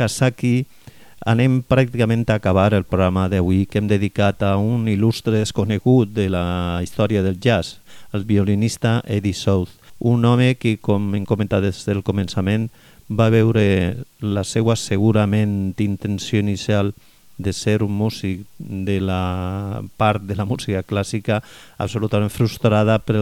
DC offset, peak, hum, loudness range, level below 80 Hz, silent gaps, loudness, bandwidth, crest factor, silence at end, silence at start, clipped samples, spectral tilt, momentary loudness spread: under 0.1%; -2 dBFS; none; 4 LU; -44 dBFS; none; -19 LUFS; 14 kHz; 18 dB; 0 s; 0 s; under 0.1%; -6.5 dB/octave; 9 LU